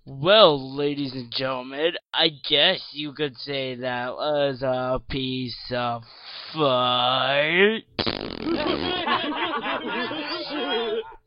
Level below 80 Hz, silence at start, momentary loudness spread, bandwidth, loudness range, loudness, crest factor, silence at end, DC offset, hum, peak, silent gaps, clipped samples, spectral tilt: -52 dBFS; 0.05 s; 11 LU; 5.6 kHz; 5 LU; -23 LUFS; 24 dB; 0.1 s; under 0.1%; none; 0 dBFS; none; under 0.1%; -8.5 dB/octave